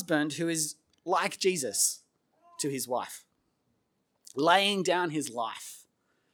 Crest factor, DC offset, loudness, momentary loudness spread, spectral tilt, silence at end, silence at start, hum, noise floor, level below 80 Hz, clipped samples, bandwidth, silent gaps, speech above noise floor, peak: 24 dB; under 0.1%; -29 LUFS; 18 LU; -2.5 dB/octave; 0.55 s; 0 s; none; -76 dBFS; -86 dBFS; under 0.1%; over 20 kHz; none; 47 dB; -8 dBFS